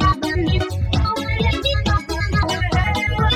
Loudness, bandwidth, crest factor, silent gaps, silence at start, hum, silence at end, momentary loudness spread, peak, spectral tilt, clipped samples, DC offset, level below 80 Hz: -20 LUFS; 15 kHz; 14 dB; none; 0 s; none; 0 s; 2 LU; -4 dBFS; -5.5 dB/octave; under 0.1%; under 0.1%; -24 dBFS